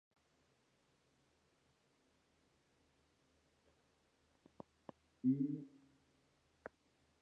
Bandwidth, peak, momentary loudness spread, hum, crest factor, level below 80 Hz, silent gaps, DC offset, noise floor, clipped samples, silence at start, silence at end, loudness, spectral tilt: 7.2 kHz; -26 dBFS; 24 LU; none; 24 dB; -84 dBFS; none; under 0.1%; -78 dBFS; under 0.1%; 5.25 s; 1.55 s; -40 LUFS; -9 dB/octave